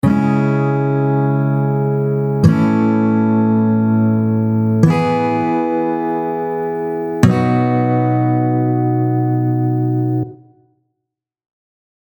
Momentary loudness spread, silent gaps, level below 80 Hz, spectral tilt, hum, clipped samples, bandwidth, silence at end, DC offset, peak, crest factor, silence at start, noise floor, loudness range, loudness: 6 LU; none; -48 dBFS; -9.5 dB/octave; none; under 0.1%; 18.5 kHz; 1.65 s; under 0.1%; 0 dBFS; 16 dB; 0.05 s; -80 dBFS; 3 LU; -16 LUFS